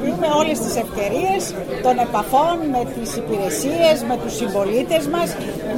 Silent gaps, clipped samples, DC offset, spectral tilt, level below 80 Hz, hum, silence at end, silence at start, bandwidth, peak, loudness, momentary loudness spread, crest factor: none; under 0.1%; under 0.1%; -4.5 dB/octave; -42 dBFS; none; 0 s; 0 s; 16.5 kHz; -4 dBFS; -20 LUFS; 7 LU; 16 dB